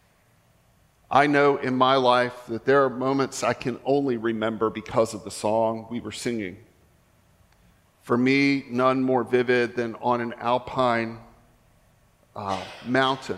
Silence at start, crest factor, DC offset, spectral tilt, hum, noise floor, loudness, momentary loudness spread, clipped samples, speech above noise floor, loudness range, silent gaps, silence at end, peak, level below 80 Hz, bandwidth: 1.1 s; 20 dB; under 0.1%; -5.5 dB/octave; none; -61 dBFS; -24 LUFS; 11 LU; under 0.1%; 38 dB; 6 LU; none; 0 s; -4 dBFS; -62 dBFS; 13.5 kHz